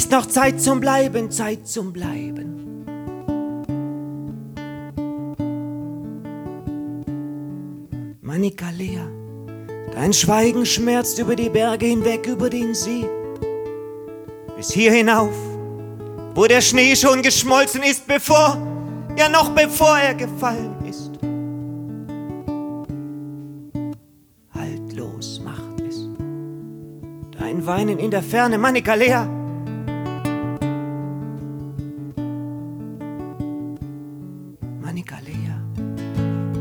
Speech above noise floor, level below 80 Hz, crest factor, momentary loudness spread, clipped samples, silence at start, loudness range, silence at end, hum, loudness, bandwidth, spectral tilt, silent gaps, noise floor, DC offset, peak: 36 dB; -48 dBFS; 20 dB; 19 LU; under 0.1%; 0 s; 16 LU; 0 s; none; -20 LUFS; over 20 kHz; -4 dB/octave; none; -54 dBFS; under 0.1%; 0 dBFS